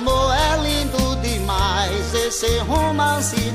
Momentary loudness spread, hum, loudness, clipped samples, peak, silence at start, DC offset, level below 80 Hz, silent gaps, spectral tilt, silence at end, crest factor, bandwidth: 3 LU; none; -19 LUFS; under 0.1%; -6 dBFS; 0 s; under 0.1%; -26 dBFS; none; -4 dB/octave; 0 s; 12 dB; 15.5 kHz